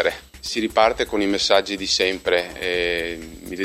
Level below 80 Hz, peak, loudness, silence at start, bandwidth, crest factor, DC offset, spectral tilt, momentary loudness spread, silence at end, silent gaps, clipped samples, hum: -46 dBFS; -2 dBFS; -21 LUFS; 0 s; 16 kHz; 20 dB; under 0.1%; -2.5 dB/octave; 11 LU; 0 s; none; under 0.1%; none